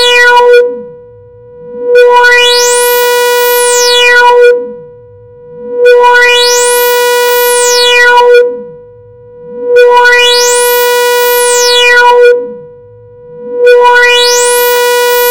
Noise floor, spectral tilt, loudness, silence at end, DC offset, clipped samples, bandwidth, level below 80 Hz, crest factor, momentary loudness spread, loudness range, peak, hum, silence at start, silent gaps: -33 dBFS; 1.5 dB/octave; -4 LUFS; 0 s; under 0.1%; 6%; over 20 kHz; -46 dBFS; 6 dB; 9 LU; 2 LU; 0 dBFS; none; 0 s; none